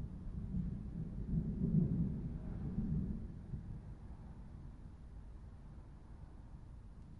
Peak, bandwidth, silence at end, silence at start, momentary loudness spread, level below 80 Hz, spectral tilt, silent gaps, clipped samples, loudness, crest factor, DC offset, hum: -22 dBFS; 4.7 kHz; 0 s; 0 s; 19 LU; -48 dBFS; -11 dB/octave; none; under 0.1%; -41 LUFS; 20 dB; under 0.1%; none